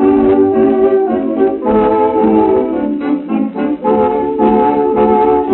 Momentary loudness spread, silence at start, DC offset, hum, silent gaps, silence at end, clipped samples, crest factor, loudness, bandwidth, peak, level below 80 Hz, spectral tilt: 6 LU; 0 s; under 0.1%; none; none; 0 s; under 0.1%; 10 dB; -12 LUFS; 4.1 kHz; 0 dBFS; -40 dBFS; -7 dB/octave